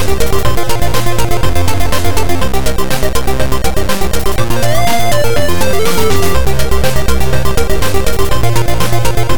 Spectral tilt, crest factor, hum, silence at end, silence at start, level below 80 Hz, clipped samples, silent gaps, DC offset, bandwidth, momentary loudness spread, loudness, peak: -4.5 dB/octave; 8 dB; none; 0 s; 0 s; -18 dBFS; 0.8%; none; 40%; 19.5 kHz; 3 LU; -14 LUFS; 0 dBFS